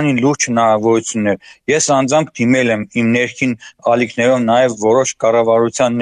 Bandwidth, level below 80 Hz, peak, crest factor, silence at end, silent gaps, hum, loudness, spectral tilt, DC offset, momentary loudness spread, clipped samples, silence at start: 10.5 kHz; -56 dBFS; -2 dBFS; 12 dB; 0 s; none; none; -14 LUFS; -4.5 dB/octave; under 0.1%; 5 LU; under 0.1%; 0 s